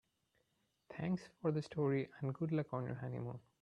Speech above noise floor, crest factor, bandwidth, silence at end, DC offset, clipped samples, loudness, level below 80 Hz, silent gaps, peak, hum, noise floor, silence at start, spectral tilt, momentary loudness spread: 42 dB; 18 dB; 9.8 kHz; 0.25 s; under 0.1%; under 0.1%; -41 LUFS; -74 dBFS; none; -24 dBFS; none; -81 dBFS; 0.9 s; -8.5 dB/octave; 8 LU